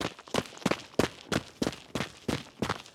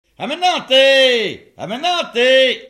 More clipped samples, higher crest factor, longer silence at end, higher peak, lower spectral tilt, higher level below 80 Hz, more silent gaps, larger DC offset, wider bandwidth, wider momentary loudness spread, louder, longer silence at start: neither; first, 24 dB vs 14 dB; about the same, 0.05 s vs 0 s; second, -10 dBFS vs -2 dBFS; first, -4.5 dB/octave vs -2 dB/octave; first, -54 dBFS vs -64 dBFS; neither; neither; first, 17.5 kHz vs 13 kHz; second, 5 LU vs 15 LU; second, -33 LUFS vs -13 LUFS; second, 0 s vs 0.2 s